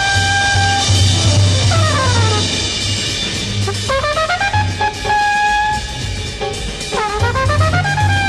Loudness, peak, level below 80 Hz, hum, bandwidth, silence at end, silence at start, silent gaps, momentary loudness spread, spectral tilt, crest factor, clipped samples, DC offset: -15 LUFS; 0 dBFS; -30 dBFS; none; 12 kHz; 0 s; 0 s; none; 8 LU; -3.5 dB/octave; 14 dB; under 0.1%; under 0.1%